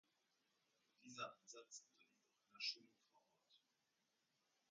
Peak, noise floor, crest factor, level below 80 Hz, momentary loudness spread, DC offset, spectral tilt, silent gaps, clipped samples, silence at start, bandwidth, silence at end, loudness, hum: -34 dBFS; -88 dBFS; 26 dB; under -90 dBFS; 13 LU; under 0.1%; -0.5 dB/octave; none; under 0.1%; 1 s; 9 kHz; 1.15 s; -53 LUFS; none